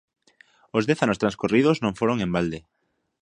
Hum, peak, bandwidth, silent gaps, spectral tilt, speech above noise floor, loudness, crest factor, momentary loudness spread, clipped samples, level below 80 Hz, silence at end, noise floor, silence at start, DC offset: none; -2 dBFS; 10.5 kHz; none; -6.5 dB/octave; 35 dB; -23 LUFS; 22 dB; 8 LU; under 0.1%; -54 dBFS; 0.65 s; -58 dBFS; 0.75 s; under 0.1%